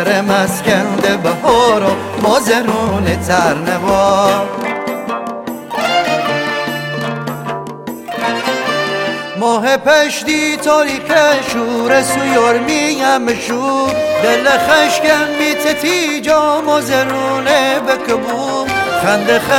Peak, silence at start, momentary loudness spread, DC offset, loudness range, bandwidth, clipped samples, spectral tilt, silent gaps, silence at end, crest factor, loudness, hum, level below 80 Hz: 0 dBFS; 0 s; 9 LU; under 0.1%; 5 LU; 17 kHz; under 0.1%; -3.5 dB/octave; none; 0 s; 14 dB; -13 LUFS; none; -46 dBFS